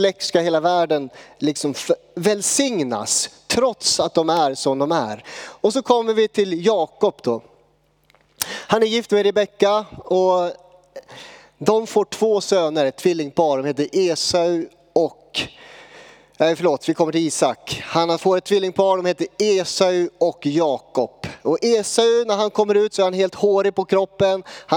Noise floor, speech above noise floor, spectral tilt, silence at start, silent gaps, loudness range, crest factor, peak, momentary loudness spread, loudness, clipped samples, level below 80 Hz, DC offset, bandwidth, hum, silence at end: -60 dBFS; 41 dB; -3.5 dB/octave; 0 s; none; 3 LU; 18 dB; 0 dBFS; 8 LU; -19 LUFS; under 0.1%; -62 dBFS; under 0.1%; 18 kHz; none; 0 s